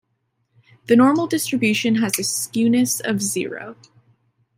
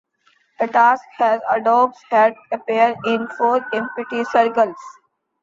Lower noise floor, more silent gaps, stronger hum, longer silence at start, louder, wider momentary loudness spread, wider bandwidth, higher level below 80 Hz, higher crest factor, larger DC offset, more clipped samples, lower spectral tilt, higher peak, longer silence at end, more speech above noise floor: first, -71 dBFS vs -61 dBFS; neither; neither; first, 0.9 s vs 0.6 s; about the same, -19 LUFS vs -18 LUFS; about the same, 11 LU vs 9 LU; first, 16 kHz vs 7.6 kHz; about the same, -66 dBFS vs -68 dBFS; about the same, 18 dB vs 16 dB; neither; neither; second, -3.5 dB/octave vs -5 dB/octave; about the same, -2 dBFS vs -2 dBFS; first, 0.85 s vs 0.5 s; first, 52 dB vs 43 dB